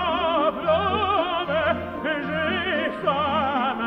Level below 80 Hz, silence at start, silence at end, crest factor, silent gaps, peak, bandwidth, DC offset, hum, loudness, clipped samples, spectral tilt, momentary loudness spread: -48 dBFS; 0 s; 0 s; 14 dB; none; -8 dBFS; 6 kHz; under 0.1%; none; -23 LUFS; under 0.1%; -7 dB/octave; 4 LU